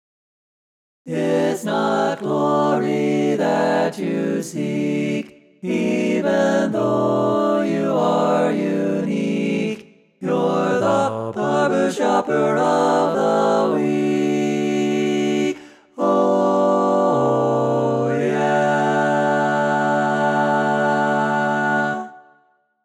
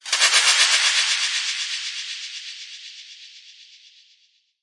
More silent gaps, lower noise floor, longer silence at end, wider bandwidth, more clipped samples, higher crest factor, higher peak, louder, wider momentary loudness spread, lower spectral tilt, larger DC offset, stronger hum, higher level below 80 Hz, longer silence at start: neither; about the same, -60 dBFS vs -62 dBFS; second, 0.65 s vs 1 s; first, 13.5 kHz vs 11.5 kHz; neither; second, 14 dB vs 22 dB; second, -6 dBFS vs -2 dBFS; about the same, -19 LUFS vs -18 LUFS; second, 6 LU vs 23 LU; first, -6 dB/octave vs 6 dB/octave; neither; neither; first, -66 dBFS vs under -90 dBFS; first, 1.05 s vs 0.05 s